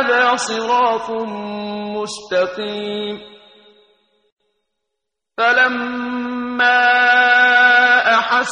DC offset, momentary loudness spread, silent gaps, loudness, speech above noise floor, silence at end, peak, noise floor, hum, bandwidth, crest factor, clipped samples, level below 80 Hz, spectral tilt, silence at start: under 0.1%; 15 LU; 4.32-4.37 s; -15 LUFS; 64 dB; 0 s; -2 dBFS; -80 dBFS; none; 10.5 kHz; 16 dB; under 0.1%; -62 dBFS; -2.5 dB/octave; 0 s